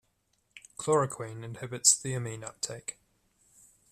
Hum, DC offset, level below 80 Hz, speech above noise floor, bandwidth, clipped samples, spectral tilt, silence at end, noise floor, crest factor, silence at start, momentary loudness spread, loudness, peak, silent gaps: none; under 0.1%; -68 dBFS; 44 dB; 14.5 kHz; under 0.1%; -2.5 dB/octave; 1 s; -74 dBFS; 26 dB; 0.55 s; 18 LU; -29 LUFS; -8 dBFS; none